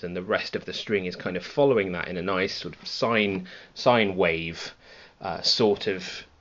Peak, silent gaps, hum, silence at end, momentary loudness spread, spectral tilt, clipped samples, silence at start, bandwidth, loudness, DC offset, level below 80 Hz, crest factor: -6 dBFS; none; none; 0.15 s; 13 LU; -2.5 dB/octave; under 0.1%; 0 s; 7.8 kHz; -25 LUFS; under 0.1%; -58 dBFS; 20 dB